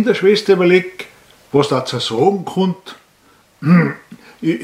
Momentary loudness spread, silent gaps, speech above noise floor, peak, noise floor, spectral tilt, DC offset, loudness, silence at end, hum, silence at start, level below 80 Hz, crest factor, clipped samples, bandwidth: 17 LU; none; 37 dB; 0 dBFS; -52 dBFS; -6.5 dB/octave; under 0.1%; -15 LUFS; 0 s; none; 0 s; -62 dBFS; 16 dB; under 0.1%; 13 kHz